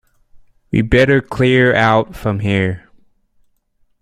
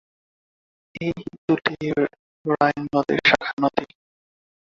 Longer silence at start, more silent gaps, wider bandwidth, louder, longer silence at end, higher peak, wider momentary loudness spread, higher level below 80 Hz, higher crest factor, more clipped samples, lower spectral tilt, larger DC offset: second, 0.35 s vs 0.95 s; second, none vs 1.38-1.48 s, 2.19-2.45 s, 3.53-3.57 s; first, 13 kHz vs 7.6 kHz; first, -14 LUFS vs -22 LUFS; first, 1.25 s vs 0.8 s; about the same, 0 dBFS vs -2 dBFS; second, 9 LU vs 12 LU; first, -36 dBFS vs -58 dBFS; second, 16 dB vs 22 dB; neither; about the same, -7 dB/octave vs -6 dB/octave; neither